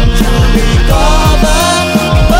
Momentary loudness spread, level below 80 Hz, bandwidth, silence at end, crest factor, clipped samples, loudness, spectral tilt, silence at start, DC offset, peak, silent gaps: 1 LU; -10 dBFS; 16.5 kHz; 0 s; 8 dB; 0.6%; -9 LUFS; -5 dB/octave; 0 s; under 0.1%; 0 dBFS; none